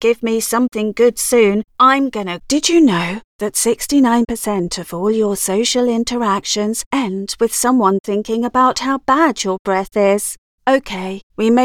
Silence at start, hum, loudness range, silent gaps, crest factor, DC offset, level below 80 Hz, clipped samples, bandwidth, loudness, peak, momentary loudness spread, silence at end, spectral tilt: 0 s; none; 2 LU; 3.24-3.39 s, 6.86-6.91 s, 8.00-8.04 s, 9.59-9.65 s, 10.38-10.58 s, 11.23-11.30 s; 14 dB; under 0.1%; -48 dBFS; under 0.1%; 18.5 kHz; -16 LUFS; 0 dBFS; 8 LU; 0 s; -3.5 dB/octave